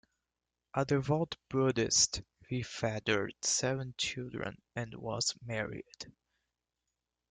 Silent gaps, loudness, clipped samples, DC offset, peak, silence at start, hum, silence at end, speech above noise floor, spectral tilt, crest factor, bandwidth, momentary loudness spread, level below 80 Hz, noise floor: none; -33 LUFS; under 0.1%; under 0.1%; -14 dBFS; 0.75 s; none; 1.2 s; 55 dB; -3.5 dB/octave; 22 dB; 11 kHz; 14 LU; -62 dBFS; -89 dBFS